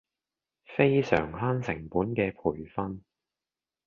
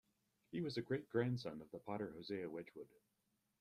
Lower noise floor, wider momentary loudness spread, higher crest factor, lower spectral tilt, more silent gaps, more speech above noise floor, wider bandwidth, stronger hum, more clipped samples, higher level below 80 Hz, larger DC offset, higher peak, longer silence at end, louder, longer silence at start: first, under -90 dBFS vs -80 dBFS; about the same, 12 LU vs 14 LU; about the same, 24 dB vs 20 dB; about the same, -8 dB/octave vs -7.5 dB/octave; neither; first, over 62 dB vs 36 dB; second, 7.2 kHz vs 14 kHz; neither; neither; first, -54 dBFS vs -78 dBFS; neither; first, -6 dBFS vs -26 dBFS; about the same, 0.85 s vs 0.75 s; first, -29 LUFS vs -45 LUFS; first, 0.7 s vs 0.5 s